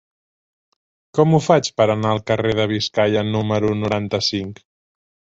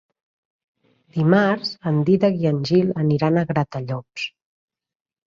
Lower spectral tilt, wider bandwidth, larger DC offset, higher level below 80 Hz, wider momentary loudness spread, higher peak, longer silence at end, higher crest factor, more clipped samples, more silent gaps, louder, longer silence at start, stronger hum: second, -5.5 dB/octave vs -8 dB/octave; about the same, 8 kHz vs 7.4 kHz; neither; first, -50 dBFS vs -58 dBFS; second, 6 LU vs 13 LU; about the same, -2 dBFS vs -4 dBFS; second, 0.75 s vs 1.05 s; about the same, 18 dB vs 18 dB; neither; neither; about the same, -19 LUFS vs -20 LUFS; about the same, 1.15 s vs 1.15 s; neither